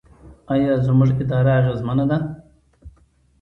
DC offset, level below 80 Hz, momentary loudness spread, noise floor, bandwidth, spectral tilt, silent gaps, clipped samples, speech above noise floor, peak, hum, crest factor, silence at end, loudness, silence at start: under 0.1%; -46 dBFS; 7 LU; -56 dBFS; 4.2 kHz; -10 dB/octave; none; under 0.1%; 38 dB; -4 dBFS; none; 16 dB; 0.5 s; -19 LUFS; 0.25 s